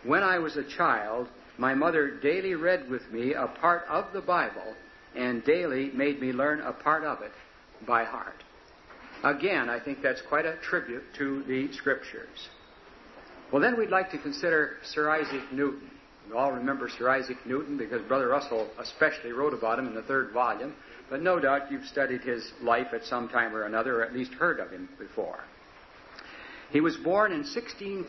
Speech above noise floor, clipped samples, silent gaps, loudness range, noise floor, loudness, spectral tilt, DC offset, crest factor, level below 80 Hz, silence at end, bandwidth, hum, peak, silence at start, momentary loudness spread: 24 dB; under 0.1%; none; 3 LU; -53 dBFS; -29 LUFS; -5.5 dB/octave; under 0.1%; 20 dB; -64 dBFS; 0 s; 6.2 kHz; none; -8 dBFS; 0 s; 15 LU